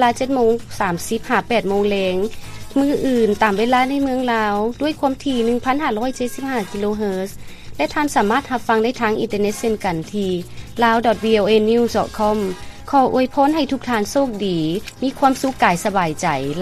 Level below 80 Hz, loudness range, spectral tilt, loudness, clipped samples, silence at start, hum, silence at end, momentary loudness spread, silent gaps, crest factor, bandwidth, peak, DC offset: -42 dBFS; 3 LU; -5 dB/octave; -19 LUFS; under 0.1%; 0 s; none; 0 s; 8 LU; none; 18 dB; 15 kHz; 0 dBFS; under 0.1%